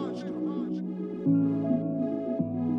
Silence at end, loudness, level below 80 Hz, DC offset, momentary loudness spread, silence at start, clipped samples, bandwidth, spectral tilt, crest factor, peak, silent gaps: 0 s; -29 LUFS; -70 dBFS; under 0.1%; 8 LU; 0 s; under 0.1%; 6.2 kHz; -10 dB/octave; 14 dB; -14 dBFS; none